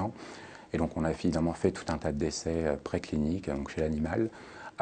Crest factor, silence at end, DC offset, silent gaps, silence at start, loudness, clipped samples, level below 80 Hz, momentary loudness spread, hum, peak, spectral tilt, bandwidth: 18 dB; 0 s; under 0.1%; none; 0 s; -32 LUFS; under 0.1%; -48 dBFS; 12 LU; none; -14 dBFS; -6 dB/octave; 9.4 kHz